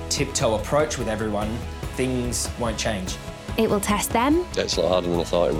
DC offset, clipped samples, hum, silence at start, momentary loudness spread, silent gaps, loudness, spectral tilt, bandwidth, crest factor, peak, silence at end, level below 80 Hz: under 0.1%; under 0.1%; none; 0 s; 8 LU; none; -24 LUFS; -4.5 dB/octave; 17 kHz; 14 dB; -10 dBFS; 0 s; -38 dBFS